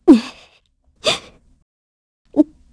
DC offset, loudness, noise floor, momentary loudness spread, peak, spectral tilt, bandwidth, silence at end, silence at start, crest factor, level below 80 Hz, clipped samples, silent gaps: under 0.1%; -18 LUFS; -58 dBFS; 11 LU; 0 dBFS; -4 dB/octave; 11 kHz; 0.3 s; 0.05 s; 20 dB; -52 dBFS; under 0.1%; 1.62-2.25 s